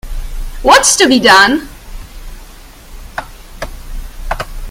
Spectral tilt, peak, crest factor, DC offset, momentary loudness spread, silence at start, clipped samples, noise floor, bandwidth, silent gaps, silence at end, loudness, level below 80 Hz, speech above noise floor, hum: -1.5 dB/octave; 0 dBFS; 14 dB; under 0.1%; 24 LU; 0.05 s; 0.5%; -34 dBFS; over 20 kHz; none; 0 s; -8 LUFS; -26 dBFS; 27 dB; none